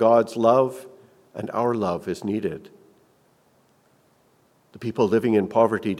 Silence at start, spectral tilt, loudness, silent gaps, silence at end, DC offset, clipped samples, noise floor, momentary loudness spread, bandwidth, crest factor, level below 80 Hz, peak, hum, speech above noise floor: 0 s; -7 dB/octave; -22 LUFS; none; 0 s; under 0.1%; under 0.1%; -61 dBFS; 16 LU; 14 kHz; 20 dB; -66 dBFS; -4 dBFS; none; 40 dB